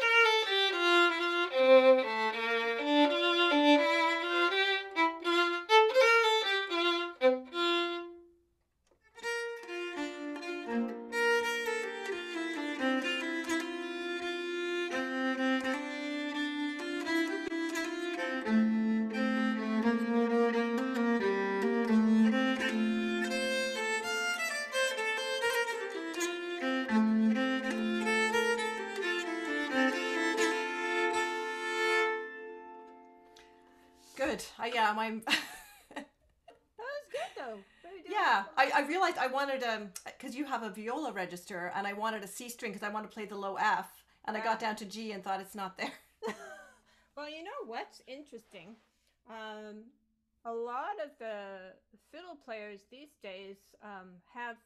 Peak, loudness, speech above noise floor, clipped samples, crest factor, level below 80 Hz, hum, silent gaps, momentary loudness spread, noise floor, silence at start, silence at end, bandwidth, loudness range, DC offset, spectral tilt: -12 dBFS; -31 LUFS; 38 dB; under 0.1%; 20 dB; -74 dBFS; none; none; 19 LU; -76 dBFS; 0 s; 0.1 s; 14.5 kHz; 16 LU; under 0.1%; -3.5 dB/octave